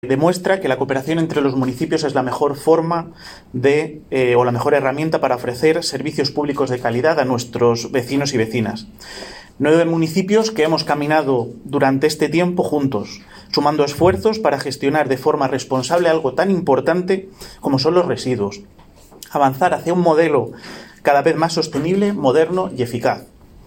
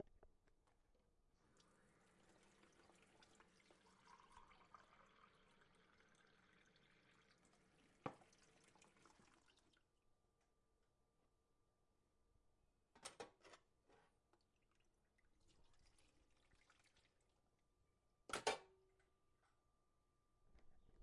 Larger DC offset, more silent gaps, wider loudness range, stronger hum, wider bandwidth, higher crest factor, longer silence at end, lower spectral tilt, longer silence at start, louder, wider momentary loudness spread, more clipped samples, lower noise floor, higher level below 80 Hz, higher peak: neither; neither; second, 2 LU vs 12 LU; neither; first, 17 kHz vs 11 kHz; second, 18 dB vs 34 dB; first, 0.4 s vs 0 s; first, -5.5 dB/octave vs -2 dB/octave; about the same, 0.05 s vs 0 s; first, -18 LUFS vs -52 LUFS; second, 8 LU vs 23 LU; neither; second, -41 dBFS vs -85 dBFS; first, -52 dBFS vs -82 dBFS; first, 0 dBFS vs -28 dBFS